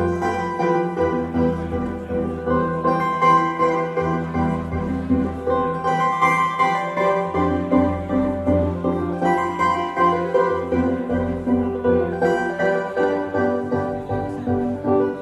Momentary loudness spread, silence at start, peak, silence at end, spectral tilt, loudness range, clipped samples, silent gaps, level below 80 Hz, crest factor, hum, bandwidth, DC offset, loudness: 6 LU; 0 s; -4 dBFS; 0 s; -7.5 dB/octave; 2 LU; under 0.1%; none; -42 dBFS; 16 dB; none; 12 kHz; under 0.1%; -21 LUFS